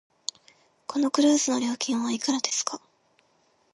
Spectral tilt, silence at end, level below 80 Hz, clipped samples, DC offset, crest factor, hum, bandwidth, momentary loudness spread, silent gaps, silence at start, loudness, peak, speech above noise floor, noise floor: -2 dB/octave; 0.95 s; -80 dBFS; under 0.1%; under 0.1%; 22 dB; none; 11.5 kHz; 15 LU; none; 0.9 s; -26 LUFS; -6 dBFS; 41 dB; -66 dBFS